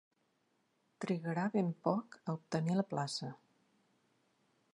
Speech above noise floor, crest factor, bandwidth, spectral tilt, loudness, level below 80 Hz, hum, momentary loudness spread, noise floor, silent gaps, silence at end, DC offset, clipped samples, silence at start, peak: 42 dB; 22 dB; 11 kHz; -6.5 dB/octave; -38 LUFS; -84 dBFS; none; 8 LU; -78 dBFS; none; 1.4 s; under 0.1%; under 0.1%; 1 s; -18 dBFS